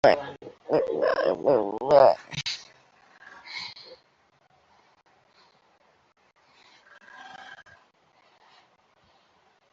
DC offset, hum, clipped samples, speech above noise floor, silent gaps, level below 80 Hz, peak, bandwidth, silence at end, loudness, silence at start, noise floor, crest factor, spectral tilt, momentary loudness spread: under 0.1%; none; under 0.1%; 43 dB; none; -66 dBFS; -4 dBFS; 7.6 kHz; 2.2 s; -24 LUFS; 0.05 s; -65 dBFS; 24 dB; -4.5 dB/octave; 28 LU